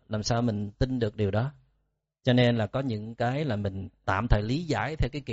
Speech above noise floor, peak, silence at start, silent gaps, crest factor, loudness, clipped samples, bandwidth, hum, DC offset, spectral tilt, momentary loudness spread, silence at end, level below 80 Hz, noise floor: 49 dB; -8 dBFS; 0.1 s; none; 20 dB; -28 LUFS; under 0.1%; 8 kHz; none; under 0.1%; -5.5 dB/octave; 8 LU; 0 s; -38 dBFS; -76 dBFS